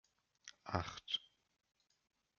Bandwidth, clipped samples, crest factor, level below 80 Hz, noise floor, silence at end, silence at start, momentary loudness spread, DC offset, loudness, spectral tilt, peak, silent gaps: 7 kHz; under 0.1%; 30 dB; -72 dBFS; -64 dBFS; 1.15 s; 0.45 s; 17 LU; under 0.1%; -43 LUFS; -2.5 dB/octave; -18 dBFS; none